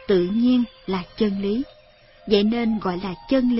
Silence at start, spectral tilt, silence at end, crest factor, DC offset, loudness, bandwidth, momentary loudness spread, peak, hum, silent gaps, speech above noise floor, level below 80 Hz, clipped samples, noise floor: 0 s; -10.5 dB/octave; 0 s; 18 dB; under 0.1%; -22 LUFS; 5.8 kHz; 10 LU; -4 dBFS; none; none; 30 dB; -50 dBFS; under 0.1%; -51 dBFS